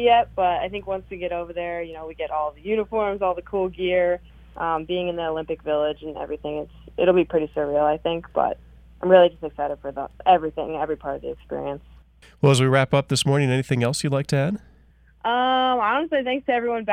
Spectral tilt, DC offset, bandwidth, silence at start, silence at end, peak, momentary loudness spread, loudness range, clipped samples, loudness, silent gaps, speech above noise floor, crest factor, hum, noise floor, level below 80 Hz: -5.5 dB/octave; under 0.1%; 14.5 kHz; 0 s; 0 s; -2 dBFS; 12 LU; 4 LU; under 0.1%; -23 LUFS; none; 32 dB; 22 dB; none; -54 dBFS; -50 dBFS